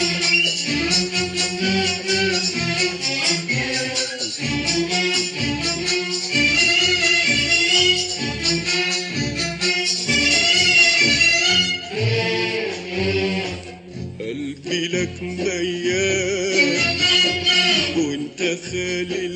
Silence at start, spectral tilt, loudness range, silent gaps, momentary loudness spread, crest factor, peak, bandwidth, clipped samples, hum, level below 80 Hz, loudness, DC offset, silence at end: 0 s; -2.5 dB/octave; 8 LU; none; 11 LU; 16 dB; -4 dBFS; 10.5 kHz; under 0.1%; none; -46 dBFS; -18 LUFS; under 0.1%; 0 s